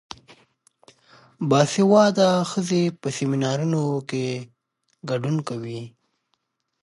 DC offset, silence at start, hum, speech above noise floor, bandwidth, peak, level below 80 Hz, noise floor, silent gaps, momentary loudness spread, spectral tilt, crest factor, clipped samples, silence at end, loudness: under 0.1%; 1.4 s; none; 53 dB; 11.5 kHz; -4 dBFS; -68 dBFS; -74 dBFS; none; 18 LU; -6 dB/octave; 20 dB; under 0.1%; 0.95 s; -22 LUFS